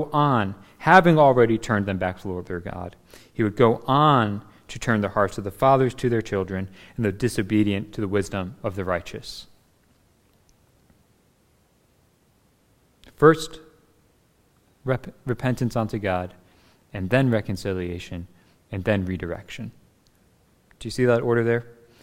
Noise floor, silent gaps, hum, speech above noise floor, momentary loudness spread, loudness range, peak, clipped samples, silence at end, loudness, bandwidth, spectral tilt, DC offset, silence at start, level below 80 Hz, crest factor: -62 dBFS; none; none; 40 dB; 18 LU; 10 LU; 0 dBFS; under 0.1%; 0.3 s; -23 LUFS; 16 kHz; -6.5 dB/octave; under 0.1%; 0 s; -50 dBFS; 24 dB